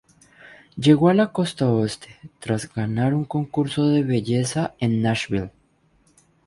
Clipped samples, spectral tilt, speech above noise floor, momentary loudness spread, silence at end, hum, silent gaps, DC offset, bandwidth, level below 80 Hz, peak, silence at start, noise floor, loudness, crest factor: under 0.1%; -6.5 dB/octave; 41 dB; 11 LU; 1 s; none; none; under 0.1%; 11.5 kHz; -54 dBFS; -2 dBFS; 0.75 s; -61 dBFS; -22 LUFS; 20 dB